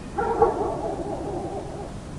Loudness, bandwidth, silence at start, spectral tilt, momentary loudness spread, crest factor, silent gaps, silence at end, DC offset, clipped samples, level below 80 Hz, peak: -27 LUFS; 11.5 kHz; 0 s; -7 dB/octave; 12 LU; 22 dB; none; 0 s; under 0.1%; under 0.1%; -42 dBFS; -4 dBFS